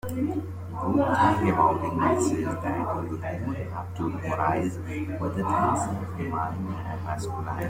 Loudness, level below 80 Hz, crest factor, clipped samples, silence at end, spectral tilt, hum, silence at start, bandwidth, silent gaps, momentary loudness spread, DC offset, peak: -27 LUFS; -52 dBFS; 18 dB; under 0.1%; 0 s; -7 dB/octave; none; 0.05 s; 16.5 kHz; none; 11 LU; under 0.1%; -8 dBFS